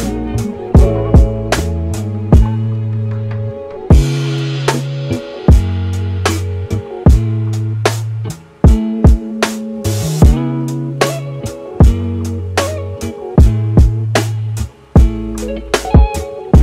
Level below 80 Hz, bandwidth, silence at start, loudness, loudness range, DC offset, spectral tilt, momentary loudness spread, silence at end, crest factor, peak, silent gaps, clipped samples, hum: -16 dBFS; 15 kHz; 0 s; -15 LUFS; 1 LU; under 0.1%; -6.5 dB/octave; 11 LU; 0 s; 12 dB; 0 dBFS; none; under 0.1%; none